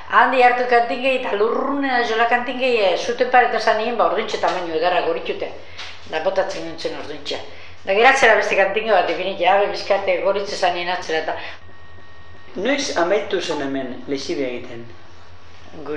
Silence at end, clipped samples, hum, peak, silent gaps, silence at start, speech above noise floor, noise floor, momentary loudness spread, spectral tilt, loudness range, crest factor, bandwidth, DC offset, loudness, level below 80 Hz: 0 s; under 0.1%; none; 0 dBFS; none; 0 s; 26 dB; -45 dBFS; 15 LU; -3 dB/octave; 7 LU; 20 dB; 10.5 kHz; 2%; -19 LUFS; -58 dBFS